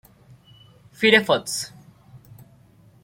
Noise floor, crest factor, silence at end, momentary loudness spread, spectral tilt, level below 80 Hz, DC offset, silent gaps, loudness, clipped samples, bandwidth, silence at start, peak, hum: -53 dBFS; 22 dB; 0.85 s; 14 LU; -3 dB/octave; -64 dBFS; under 0.1%; none; -19 LUFS; under 0.1%; 16.5 kHz; 1 s; -2 dBFS; none